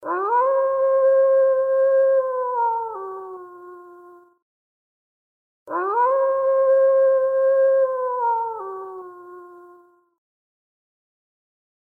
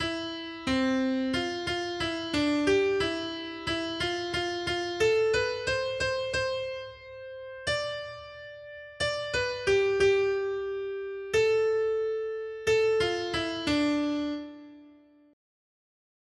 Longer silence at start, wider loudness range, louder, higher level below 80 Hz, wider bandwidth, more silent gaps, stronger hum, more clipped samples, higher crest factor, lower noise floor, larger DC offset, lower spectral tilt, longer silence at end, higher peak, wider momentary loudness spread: about the same, 0 s vs 0 s; first, 13 LU vs 5 LU; first, -19 LUFS vs -28 LUFS; second, -84 dBFS vs -54 dBFS; second, 2.6 kHz vs 12 kHz; first, 4.42-5.66 s vs none; neither; neither; about the same, 12 dB vs 16 dB; second, -52 dBFS vs -56 dBFS; neither; first, -6.5 dB/octave vs -4 dB/octave; first, 2.3 s vs 1.4 s; first, -10 dBFS vs -14 dBFS; first, 18 LU vs 14 LU